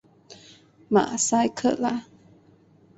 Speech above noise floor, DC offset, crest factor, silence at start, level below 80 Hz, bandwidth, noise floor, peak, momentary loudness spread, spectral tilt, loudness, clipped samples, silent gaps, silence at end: 34 dB; under 0.1%; 20 dB; 0.3 s; -64 dBFS; 8.2 kHz; -56 dBFS; -8 dBFS; 6 LU; -4 dB/octave; -24 LUFS; under 0.1%; none; 0.95 s